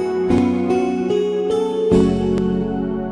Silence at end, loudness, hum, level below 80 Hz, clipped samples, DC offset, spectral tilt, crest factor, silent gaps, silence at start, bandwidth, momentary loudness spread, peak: 0 s; -18 LUFS; none; -38 dBFS; under 0.1%; under 0.1%; -8 dB/octave; 14 dB; none; 0 s; 11 kHz; 5 LU; -4 dBFS